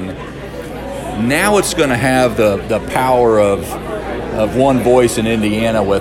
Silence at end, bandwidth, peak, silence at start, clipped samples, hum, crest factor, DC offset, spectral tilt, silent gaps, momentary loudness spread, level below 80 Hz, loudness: 0 s; 16.5 kHz; 0 dBFS; 0 s; under 0.1%; none; 14 dB; under 0.1%; -5 dB/octave; none; 14 LU; -34 dBFS; -14 LUFS